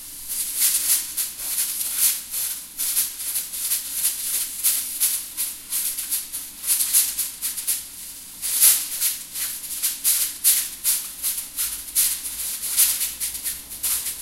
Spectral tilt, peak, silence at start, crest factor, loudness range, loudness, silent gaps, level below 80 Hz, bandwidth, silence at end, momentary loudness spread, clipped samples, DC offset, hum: 2.5 dB/octave; 0 dBFS; 0 s; 24 dB; 3 LU; -21 LUFS; none; -56 dBFS; 16 kHz; 0 s; 9 LU; under 0.1%; under 0.1%; none